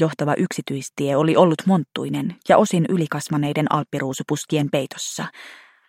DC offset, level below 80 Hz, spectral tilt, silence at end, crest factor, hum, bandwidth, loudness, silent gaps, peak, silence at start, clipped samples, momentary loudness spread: under 0.1%; -66 dBFS; -6 dB/octave; 0.35 s; 20 dB; none; 16 kHz; -21 LUFS; none; -2 dBFS; 0 s; under 0.1%; 11 LU